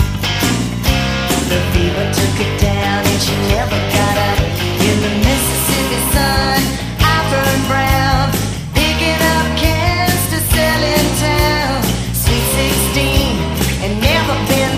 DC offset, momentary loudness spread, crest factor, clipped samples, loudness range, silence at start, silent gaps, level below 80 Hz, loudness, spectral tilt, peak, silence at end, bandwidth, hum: under 0.1%; 3 LU; 14 dB; under 0.1%; 1 LU; 0 s; none; -22 dBFS; -14 LUFS; -4 dB/octave; 0 dBFS; 0 s; 15.5 kHz; none